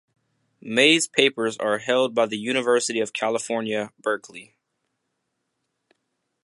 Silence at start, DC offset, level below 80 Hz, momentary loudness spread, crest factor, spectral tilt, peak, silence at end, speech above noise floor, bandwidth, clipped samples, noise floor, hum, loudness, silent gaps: 0.65 s; under 0.1%; -74 dBFS; 11 LU; 22 dB; -2.5 dB/octave; -2 dBFS; 2 s; 55 dB; 11.5 kHz; under 0.1%; -77 dBFS; none; -22 LUFS; none